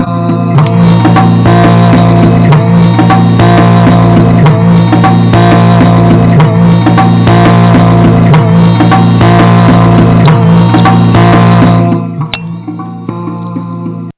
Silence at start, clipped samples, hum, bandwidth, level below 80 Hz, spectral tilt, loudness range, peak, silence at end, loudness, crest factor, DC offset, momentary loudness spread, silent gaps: 0 s; under 0.1%; none; 4 kHz; -26 dBFS; -12 dB/octave; 2 LU; 0 dBFS; 0.05 s; -5 LUFS; 4 dB; under 0.1%; 13 LU; none